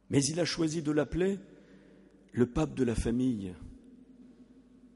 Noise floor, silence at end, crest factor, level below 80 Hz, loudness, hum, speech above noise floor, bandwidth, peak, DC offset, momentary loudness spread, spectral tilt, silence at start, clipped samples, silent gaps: -58 dBFS; 0.1 s; 20 dB; -50 dBFS; -31 LUFS; none; 28 dB; 11.5 kHz; -12 dBFS; under 0.1%; 11 LU; -5.5 dB/octave; 0.1 s; under 0.1%; none